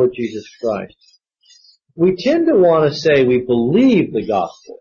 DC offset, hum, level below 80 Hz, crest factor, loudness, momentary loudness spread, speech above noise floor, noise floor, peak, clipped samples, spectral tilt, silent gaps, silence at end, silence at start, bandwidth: under 0.1%; none; -52 dBFS; 12 dB; -16 LUFS; 13 LU; 37 dB; -52 dBFS; -4 dBFS; under 0.1%; -7 dB/octave; none; 0.05 s; 0 s; 7 kHz